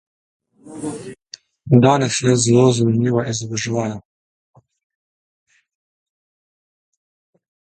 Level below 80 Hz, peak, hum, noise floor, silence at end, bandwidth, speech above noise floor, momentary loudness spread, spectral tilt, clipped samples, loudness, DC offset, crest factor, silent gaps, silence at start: -56 dBFS; 0 dBFS; none; -44 dBFS; 3.75 s; 11 kHz; 28 dB; 22 LU; -5.5 dB/octave; under 0.1%; -17 LUFS; under 0.1%; 20 dB; none; 0.65 s